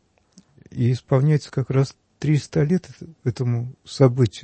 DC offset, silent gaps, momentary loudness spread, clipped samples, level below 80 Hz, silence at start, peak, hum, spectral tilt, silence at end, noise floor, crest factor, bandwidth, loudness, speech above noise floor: under 0.1%; none; 10 LU; under 0.1%; -54 dBFS; 0.75 s; -4 dBFS; none; -8 dB/octave; 0.05 s; -55 dBFS; 18 dB; 8.6 kHz; -22 LUFS; 35 dB